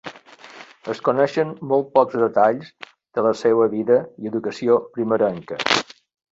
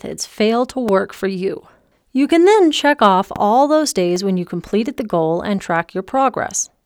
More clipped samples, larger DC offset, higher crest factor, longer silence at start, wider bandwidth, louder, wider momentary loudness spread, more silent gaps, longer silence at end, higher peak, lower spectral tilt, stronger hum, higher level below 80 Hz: neither; neither; about the same, 20 dB vs 16 dB; about the same, 0.05 s vs 0.05 s; second, 8 kHz vs 17.5 kHz; second, -20 LUFS vs -17 LUFS; first, 16 LU vs 10 LU; neither; first, 0.5 s vs 0.2 s; about the same, -2 dBFS vs 0 dBFS; about the same, -5 dB/octave vs -4.5 dB/octave; neither; second, -66 dBFS vs -52 dBFS